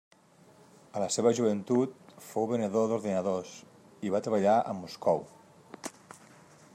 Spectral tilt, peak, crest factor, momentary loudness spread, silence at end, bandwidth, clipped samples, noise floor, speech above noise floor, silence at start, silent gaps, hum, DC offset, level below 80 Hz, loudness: -5.5 dB/octave; -12 dBFS; 18 dB; 17 LU; 0.85 s; 15.5 kHz; under 0.1%; -59 dBFS; 30 dB; 0.95 s; none; none; under 0.1%; -78 dBFS; -30 LUFS